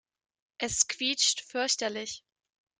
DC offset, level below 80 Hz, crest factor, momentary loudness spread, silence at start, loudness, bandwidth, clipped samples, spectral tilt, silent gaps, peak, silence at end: under 0.1%; -64 dBFS; 24 dB; 13 LU; 0.6 s; -28 LUFS; 12 kHz; under 0.1%; 0 dB/octave; none; -8 dBFS; 0.6 s